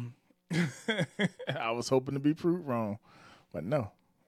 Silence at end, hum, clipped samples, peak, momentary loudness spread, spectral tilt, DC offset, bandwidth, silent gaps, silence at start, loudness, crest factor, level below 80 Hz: 0.4 s; none; under 0.1%; -14 dBFS; 13 LU; -6 dB/octave; under 0.1%; 14 kHz; none; 0 s; -33 LUFS; 18 dB; -70 dBFS